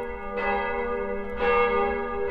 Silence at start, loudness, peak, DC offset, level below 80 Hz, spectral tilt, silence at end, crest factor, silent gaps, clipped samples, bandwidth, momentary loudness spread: 0 s; -26 LUFS; -10 dBFS; under 0.1%; -42 dBFS; -7 dB/octave; 0 s; 16 dB; none; under 0.1%; 5.4 kHz; 8 LU